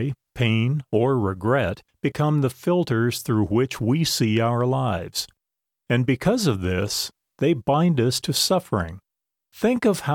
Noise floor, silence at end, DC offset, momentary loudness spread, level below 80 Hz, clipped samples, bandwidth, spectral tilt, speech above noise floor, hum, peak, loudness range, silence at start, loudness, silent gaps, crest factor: -85 dBFS; 0 s; under 0.1%; 7 LU; -50 dBFS; under 0.1%; 17.5 kHz; -5.5 dB/octave; 63 dB; none; -6 dBFS; 1 LU; 0 s; -22 LUFS; none; 16 dB